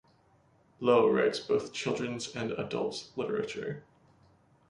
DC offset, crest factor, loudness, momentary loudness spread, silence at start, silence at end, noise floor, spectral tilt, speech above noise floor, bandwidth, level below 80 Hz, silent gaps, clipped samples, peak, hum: under 0.1%; 22 dB; -31 LUFS; 12 LU; 0.8 s; 0.9 s; -65 dBFS; -5 dB/octave; 35 dB; 11 kHz; -68 dBFS; none; under 0.1%; -10 dBFS; none